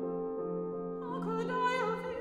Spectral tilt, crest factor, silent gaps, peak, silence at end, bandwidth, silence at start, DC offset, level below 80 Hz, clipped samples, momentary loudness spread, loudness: -6.5 dB/octave; 14 dB; none; -20 dBFS; 0 s; 11 kHz; 0 s; under 0.1%; -68 dBFS; under 0.1%; 7 LU; -35 LUFS